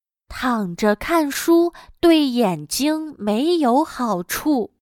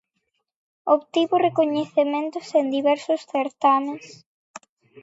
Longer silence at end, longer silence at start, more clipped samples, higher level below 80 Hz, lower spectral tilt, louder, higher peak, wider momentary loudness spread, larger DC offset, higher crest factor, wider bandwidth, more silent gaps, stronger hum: second, 0.3 s vs 0.45 s; second, 0.3 s vs 0.85 s; neither; first, -48 dBFS vs -78 dBFS; about the same, -4.5 dB/octave vs -5 dB/octave; first, -19 LUFS vs -22 LUFS; about the same, -4 dBFS vs -6 dBFS; about the same, 7 LU vs 7 LU; neither; about the same, 16 dB vs 18 dB; first, 18.5 kHz vs 8 kHz; second, none vs 4.26-4.54 s; neither